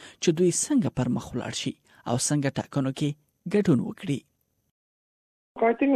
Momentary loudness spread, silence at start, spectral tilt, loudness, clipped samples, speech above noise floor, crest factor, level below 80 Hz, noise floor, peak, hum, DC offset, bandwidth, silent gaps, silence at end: 9 LU; 0 s; -5 dB/octave; -26 LUFS; under 0.1%; over 65 dB; 18 dB; -58 dBFS; under -90 dBFS; -10 dBFS; none; under 0.1%; 14.5 kHz; 4.71-5.55 s; 0 s